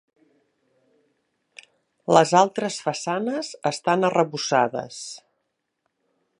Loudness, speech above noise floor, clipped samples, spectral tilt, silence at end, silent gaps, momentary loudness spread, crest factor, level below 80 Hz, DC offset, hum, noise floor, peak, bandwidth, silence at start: -22 LUFS; 55 dB; under 0.1%; -4.5 dB/octave; 1.25 s; none; 17 LU; 24 dB; -74 dBFS; under 0.1%; none; -77 dBFS; 0 dBFS; 11.5 kHz; 2.1 s